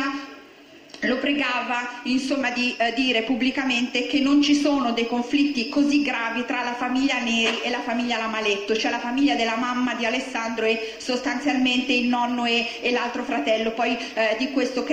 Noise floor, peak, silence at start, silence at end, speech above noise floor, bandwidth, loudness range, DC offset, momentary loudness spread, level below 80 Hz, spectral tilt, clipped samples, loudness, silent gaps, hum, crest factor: -47 dBFS; -8 dBFS; 0 s; 0 s; 25 dB; 9.6 kHz; 2 LU; under 0.1%; 5 LU; -58 dBFS; -3 dB/octave; under 0.1%; -23 LUFS; none; none; 14 dB